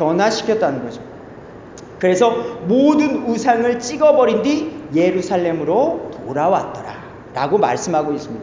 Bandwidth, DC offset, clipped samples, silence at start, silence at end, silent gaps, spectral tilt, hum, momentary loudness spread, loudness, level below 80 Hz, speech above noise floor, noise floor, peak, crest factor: 7.6 kHz; under 0.1%; under 0.1%; 0 s; 0 s; none; -5.5 dB/octave; none; 20 LU; -17 LUFS; -52 dBFS; 20 dB; -37 dBFS; -2 dBFS; 16 dB